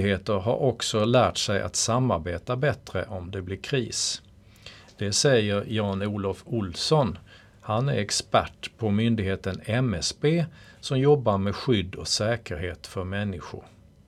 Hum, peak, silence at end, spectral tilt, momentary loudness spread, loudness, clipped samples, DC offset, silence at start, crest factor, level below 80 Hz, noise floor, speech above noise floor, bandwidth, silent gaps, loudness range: none; -6 dBFS; 0.45 s; -4.5 dB/octave; 13 LU; -26 LUFS; under 0.1%; under 0.1%; 0 s; 20 dB; -52 dBFS; -49 dBFS; 23 dB; 14 kHz; none; 2 LU